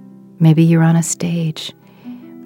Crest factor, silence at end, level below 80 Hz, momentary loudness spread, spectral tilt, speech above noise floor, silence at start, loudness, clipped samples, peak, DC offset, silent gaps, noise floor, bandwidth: 16 dB; 0 s; -64 dBFS; 23 LU; -6 dB/octave; 22 dB; 0.4 s; -14 LUFS; under 0.1%; 0 dBFS; under 0.1%; none; -35 dBFS; 13 kHz